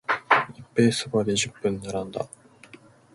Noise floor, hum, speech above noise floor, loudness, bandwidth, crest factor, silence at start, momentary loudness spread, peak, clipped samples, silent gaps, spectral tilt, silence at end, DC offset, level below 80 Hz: -51 dBFS; none; 26 dB; -25 LUFS; 11.5 kHz; 22 dB; 0.1 s; 12 LU; -4 dBFS; under 0.1%; none; -4 dB/octave; 0.9 s; under 0.1%; -58 dBFS